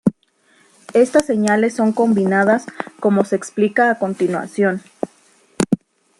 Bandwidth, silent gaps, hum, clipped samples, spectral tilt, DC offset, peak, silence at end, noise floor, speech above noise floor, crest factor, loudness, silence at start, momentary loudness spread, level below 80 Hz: 12 kHz; none; none; under 0.1%; -6 dB/octave; under 0.1%; 0 dBFS; 0.45 s; -57 dBFS; 41 dB; 18 dB; -17 LUFS; 0.05 s; 9 LU; -56 dBFS